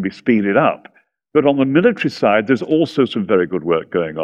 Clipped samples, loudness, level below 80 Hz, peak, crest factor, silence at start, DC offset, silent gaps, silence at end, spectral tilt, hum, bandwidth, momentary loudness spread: under 0.1%; -16 LUFS; -58 dBFS; 0 dBFS; 16 dB; 0 s; under 0.1%; none; 0 s; -7.5 dB/octave; none; 8.6 kHz; 5 LU